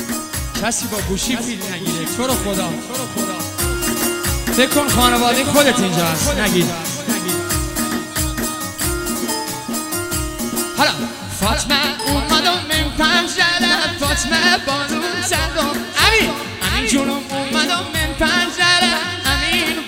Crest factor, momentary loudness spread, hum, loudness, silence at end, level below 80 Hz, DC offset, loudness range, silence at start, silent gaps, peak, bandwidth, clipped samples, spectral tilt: 18 dB; 9 LU; none; -17 LUFS; 0 s; -32 dBFS; under 0.1%; 5 LU; 0 s; none; 0 dBFS; 16.5 kHz; under 0.1%; -3 dB/octave